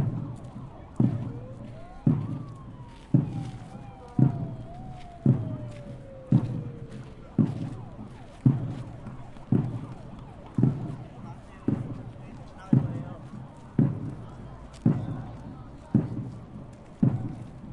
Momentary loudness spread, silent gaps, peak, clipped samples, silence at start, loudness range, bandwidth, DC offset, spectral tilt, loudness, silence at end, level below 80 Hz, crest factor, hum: 18 LU; none; -8 dBFS; under 0.1%; 0 s; 2 LU; 5.8 kHz; under 0.1%; -10 dB/octave; -29 LUFS; 0 s; -50 dBFS; 22 dB; none